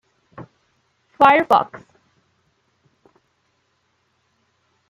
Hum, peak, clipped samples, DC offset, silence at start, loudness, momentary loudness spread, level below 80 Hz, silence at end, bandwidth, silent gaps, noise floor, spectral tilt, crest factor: none; -2 dBFS; under 0.1%; under 0.1%; 0.4 s; -16 LUFS; 29 LU; -66 dBFS; 3.1 s; 14 kHz; none; -67 dBFS; -5.5 dB/octave; 22 dB